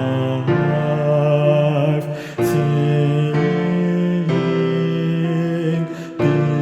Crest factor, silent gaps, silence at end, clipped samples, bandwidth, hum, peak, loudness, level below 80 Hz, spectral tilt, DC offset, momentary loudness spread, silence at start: 14 dB; none; 0 s; under 0.1%; 13.5 kHz; none; -4 dBFS; -18 LUFS; -54 dBFS; -8 dB/octave; under 0.1%; 5 LU; 0 s